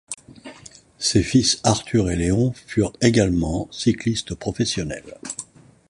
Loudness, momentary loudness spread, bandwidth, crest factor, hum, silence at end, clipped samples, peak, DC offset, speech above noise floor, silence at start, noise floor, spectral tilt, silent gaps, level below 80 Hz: -21 LUFS; 17 LU; 11.5 kHz; 20 dB; none; 0.45 s; under 0.1%; -2 dBFS; under 0.1%; 25 dB; 0.1 s; -46 dBFS; -4.5 dB/octave; none; -40 dBFS